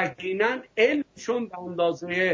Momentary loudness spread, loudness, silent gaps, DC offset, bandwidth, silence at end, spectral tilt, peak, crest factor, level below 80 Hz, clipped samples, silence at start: 7 LU; -26 LUFS; none; under 0.1%; 7.6 kHz; 0 s; -5 dB/octave; -10 dBFS; 16 dB; -66 dBFS; under 0.1%; 0 s